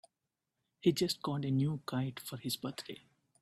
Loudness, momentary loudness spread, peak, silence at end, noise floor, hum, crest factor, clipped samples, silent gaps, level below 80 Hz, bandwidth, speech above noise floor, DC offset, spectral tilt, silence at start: -36 LUFS; 13 LU; -16 dBFS; 0.45 s; -88 dBFS; none; 22 dB; under 0.1%; none; -72 dBFS; 16 kHz; 53 dB; under 0.1%; -5.5 dB/octave; 0.85 s